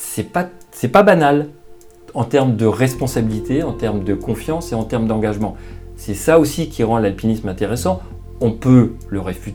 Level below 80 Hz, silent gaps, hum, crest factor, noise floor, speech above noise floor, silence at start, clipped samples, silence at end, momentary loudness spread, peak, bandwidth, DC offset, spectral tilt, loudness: -36 dBFS; none; none; 18 dB; -40 dBFS; 23 dB; 0 s; under 0.1%; 0 s; 13 LU; 0 dBFS; over 20 kHz; under 0.1%; -6.5 dB/octave; -17 LUFS